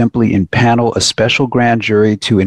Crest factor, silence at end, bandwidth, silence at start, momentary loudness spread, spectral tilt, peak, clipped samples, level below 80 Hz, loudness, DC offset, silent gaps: 10 dB; 0 s; 12 kHz; 0 s; 2 LU; -5 dB/octave; 0 dBFS; under 0.1%; -44 dBFS; -12 LUFS; under 0.1%; none